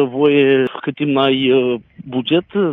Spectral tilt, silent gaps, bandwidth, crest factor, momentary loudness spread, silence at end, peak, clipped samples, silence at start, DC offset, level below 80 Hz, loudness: -8.5 dB/octave; none; 4 kHz; 14 dB; 10 LU; 0 s; -2 dBFS; under 0.1%; 0 s; under 0.1%; -60 dBFS; -16 LUFS